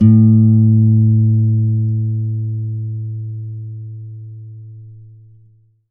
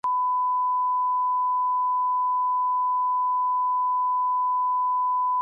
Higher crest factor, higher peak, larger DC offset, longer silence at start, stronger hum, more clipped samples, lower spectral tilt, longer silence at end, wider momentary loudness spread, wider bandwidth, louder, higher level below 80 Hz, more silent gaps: first, 14 dB vs 4 dB; first, 0 dBFS vs -20 dBFS; neither; about the same, 0 s vs 0.05 s; second, none vs 50 Hz at -105 dBFS; neither; first, -14.5 dB/octave vs -3 dB/octave; first, 0.85 s vs 0 s; first, 23 LU vs 0 LU; second, 1.3 kHz vs 1.7 kHz; first, -14 LUFS vs -23 LUFS; first, -54 dBFS vs -86 dBFS; neither